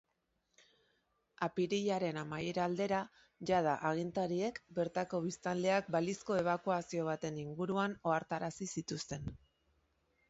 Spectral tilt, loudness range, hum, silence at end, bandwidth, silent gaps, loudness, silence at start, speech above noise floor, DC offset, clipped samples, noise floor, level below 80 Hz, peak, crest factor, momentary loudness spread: -5 dB/octave; 3 LU; none; 0.95 s; 8 kHz; none; -37 LUFS; 1.4 s; 45 dB; under 0.1%; under 0.1%; -82 dBFS; -68 dBFS; -20 dBFS; 18 dB; 8 LU